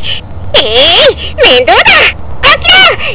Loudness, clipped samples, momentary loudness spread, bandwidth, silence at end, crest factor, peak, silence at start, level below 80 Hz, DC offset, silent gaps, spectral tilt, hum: -4 LUFS; 10%; 7 LU; 4 kHz; 0 s; 6 dB; 0 dBFS; 0 s; -26 dBFS; under 0.1%; none; -6.5 dB/octave; none